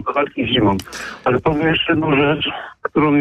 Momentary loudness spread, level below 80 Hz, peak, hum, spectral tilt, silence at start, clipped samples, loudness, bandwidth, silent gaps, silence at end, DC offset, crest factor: 8 LU; -42 dBFS; -6 dBFS; none; -6 dB/octave; 0 s; under 0.1%; -17 LUFS; 14 kHz; none; 0 s; under 0.1%; 12 dB